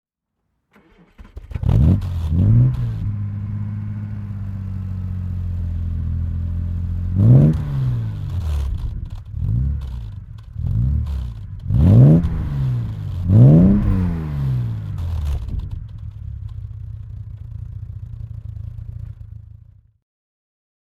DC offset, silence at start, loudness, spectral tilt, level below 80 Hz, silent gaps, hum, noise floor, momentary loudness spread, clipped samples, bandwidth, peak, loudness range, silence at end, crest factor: under 0.1%; 1.2 s; -19 LUFS; -10.5 dB/octave; -28 dBFS; none; none; -75 dBFS; 21 LU; under 0.1%; 4.7 kHz; 0 dBFS; 18 LU; 1.35 s; 18 dB